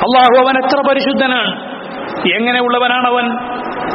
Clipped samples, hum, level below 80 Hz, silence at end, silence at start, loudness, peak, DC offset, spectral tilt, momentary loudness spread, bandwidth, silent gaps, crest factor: under 0.1%; none; -54 dBFS; 0 s; 0 s; -13 LUFS; 0 dBFS; under 0.1%; -1 dB/octave; 14 LU; 5.8 kHz; none; 14 dB